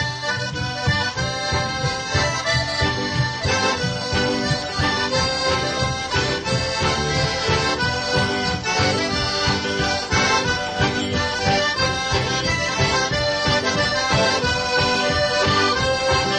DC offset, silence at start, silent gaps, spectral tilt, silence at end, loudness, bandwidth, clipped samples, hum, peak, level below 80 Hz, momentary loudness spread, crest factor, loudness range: under 0.1%; 0 s; none; -3.5 dB/octave; 0 s; -20 LUFS; 10 kHz; under 0.1%; none; -6 dBFS; -38 dBFS; 4 LU; 16 dB; 2 LU